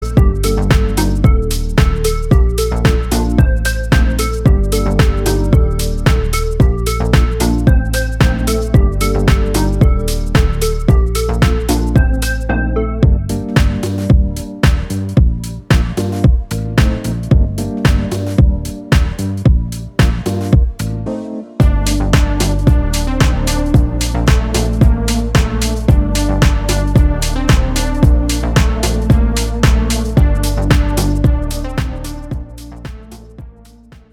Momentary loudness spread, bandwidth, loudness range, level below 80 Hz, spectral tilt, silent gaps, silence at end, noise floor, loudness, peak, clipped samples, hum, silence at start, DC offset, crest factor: 5 LU; 16.5 kHz; 2 LU; -16 dBFS; -6 dB/octave; none; 0.6 s; -40 dBFS; -15 LUFS; 0 dBFS; under 0.1%; none; 0 s; under 0.1%; 12 dB